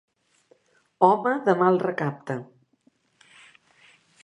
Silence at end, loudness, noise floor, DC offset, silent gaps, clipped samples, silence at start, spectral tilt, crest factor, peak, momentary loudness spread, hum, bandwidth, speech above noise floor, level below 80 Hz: 1.8 s; -23 LUFS; -66 dBFS; under 0.1%; none; under 0.1%; 1 s; -8 dB/octave; 24 dB; -4 dBFS; 14 LU; none; 10 kHz; 43 dB; -78 dBFS